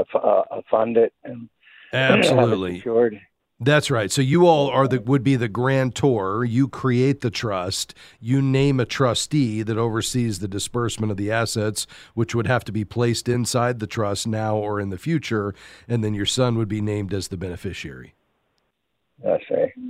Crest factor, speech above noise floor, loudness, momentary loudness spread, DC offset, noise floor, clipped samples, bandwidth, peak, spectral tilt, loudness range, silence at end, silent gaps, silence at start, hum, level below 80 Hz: 20 dB; 53 dB; -22 LUFS; 10 LU; under 0.1%; -74 dBFS; under 0.1%; 15.5 kHz; -2 dBFS; -5.5 dB/octave; 6 LU; 0 s; none; 0 s; none; -52 dBFS